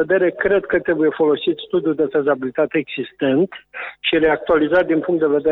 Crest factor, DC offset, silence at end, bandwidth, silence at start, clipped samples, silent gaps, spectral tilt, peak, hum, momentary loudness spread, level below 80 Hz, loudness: 14 dB; under 0.1%; 0 s; 4.1 kHz; 0 s; under 0.1%; none; -8.5 dB/octave; -4 dBFS; none; 6 LU; -50 dBFS; -18 LUFS